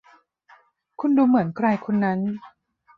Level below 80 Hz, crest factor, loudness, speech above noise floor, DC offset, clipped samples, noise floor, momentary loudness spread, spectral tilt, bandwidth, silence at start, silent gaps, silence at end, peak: -68 dBFS; 16 dB; -22 LUFS; 35 dB; under 0.1%; under 0.1%; -56 dBFS; 11 LU; -10 dB/octave; 5 kHz; 1 s; none; 0.5 s; -6 dBFS